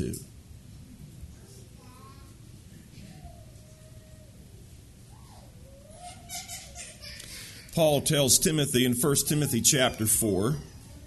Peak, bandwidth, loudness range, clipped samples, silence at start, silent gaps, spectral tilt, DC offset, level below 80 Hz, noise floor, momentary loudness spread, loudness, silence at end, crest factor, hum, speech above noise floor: -6 dBFS; 12.5 kHz; 26 LU; under 0.1%; 0 s; none; -3.5 dB/octave; under 0.1%; -52 dBFS; -50 dBFS; 27 LU; -24 LUFS; 0 s; 24 dB; none; 25 dB